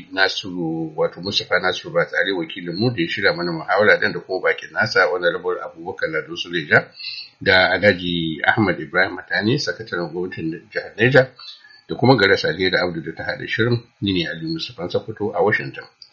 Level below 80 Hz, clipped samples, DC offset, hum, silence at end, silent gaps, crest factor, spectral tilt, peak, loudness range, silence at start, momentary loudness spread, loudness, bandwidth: -56 dBFS; under 0.1%; under 0.1%; none; 0.25 s; none; 20 dB; -3 dB/octave; 0 dBFS; 3 LU; 0 s; 12 LU; -20 LUFS; 7.4 kHz